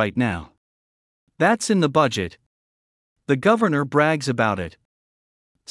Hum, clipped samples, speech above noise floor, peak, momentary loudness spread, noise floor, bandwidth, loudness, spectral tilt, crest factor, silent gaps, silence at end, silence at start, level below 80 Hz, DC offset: none; under 0.1%; over 70 dB; -4 dBFS; 13 LU; under -90 dBFS; 12 kHz; -20 LUFS; -5.5 dB/octave; 20 dB; 0.57-1.27 s, 2.46-3.16 s; 1 s; 0 s; -58 dBFS; under 0.1%